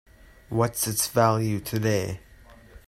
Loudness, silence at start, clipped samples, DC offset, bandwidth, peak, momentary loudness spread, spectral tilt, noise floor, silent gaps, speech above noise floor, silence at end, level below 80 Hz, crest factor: -25 LUFS; 0.5 s; under 0.1%; under 0.1%; 16 kHz; -6 dBFS; 10 LU; -4.5 dB/octave; -50 dBFS; none; 26 dB; 0.1 s; -52 dBFS; 20 dB